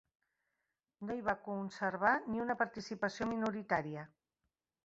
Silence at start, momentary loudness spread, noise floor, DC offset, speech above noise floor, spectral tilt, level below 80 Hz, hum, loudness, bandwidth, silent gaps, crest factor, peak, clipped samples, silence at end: 1 s; 12 LU; -88 dBFS; under 0.1%; 51 dB; -4 dB/octave; -70 dBFS; none; -37 LUFS; 7.6 kHz; none; 22 dB; -18 dBFS; under 0.1%; 0.8 s